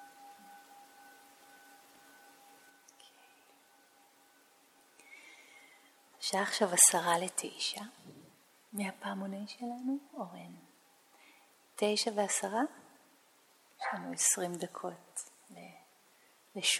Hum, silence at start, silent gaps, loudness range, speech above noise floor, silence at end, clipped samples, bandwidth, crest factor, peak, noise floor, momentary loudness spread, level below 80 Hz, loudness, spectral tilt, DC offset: none; 0 s; none; 12 LU; 32 dB; 0 s; under 0.1%; 17.5 kHz; 32 dB; -6 dBFS; -66 dBFS; 25 LU; under -90 dBFS; -32 LUFS; -1.5 dB/octave; under 0.1%